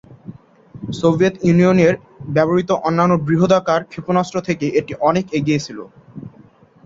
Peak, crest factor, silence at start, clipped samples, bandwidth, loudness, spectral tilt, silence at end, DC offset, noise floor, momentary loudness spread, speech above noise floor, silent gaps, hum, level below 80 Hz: -2 dBFS; 16 dB; 0.1 s; under 0.1%; 7.6 kHz; -17 LUFS; -7 dB/octave; 0.55 s; under 0.1%; -47 dBFS; 18 LU; 31 dB; none; none; -52 dBFS